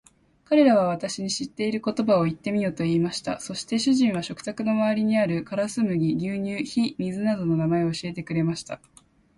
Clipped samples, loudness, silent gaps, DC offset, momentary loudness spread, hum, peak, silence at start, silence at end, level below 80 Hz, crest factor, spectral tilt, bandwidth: under 0.1%; -25 LUFS; none; under 0.1%; 9 LU; none; -6 dBFS; 0.5 s; 0.6 s; -60 dBFS; 18 dB; -6 dB/octave; 11.5 kHz